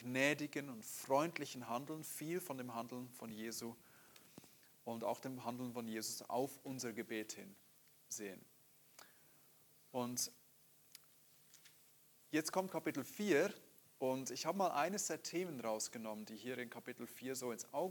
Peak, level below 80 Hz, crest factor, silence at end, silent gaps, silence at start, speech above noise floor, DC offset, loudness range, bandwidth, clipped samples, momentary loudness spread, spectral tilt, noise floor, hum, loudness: -20 dBFS; under -90 dBFS; 24 dB; 0 s; none; 0 s; 26 dB; under 0.1%; 9 LU; 19 kHz; under 0.1%; 24 LU; -3.5 dB/octave; -69 dBFS; none; -43 LUFS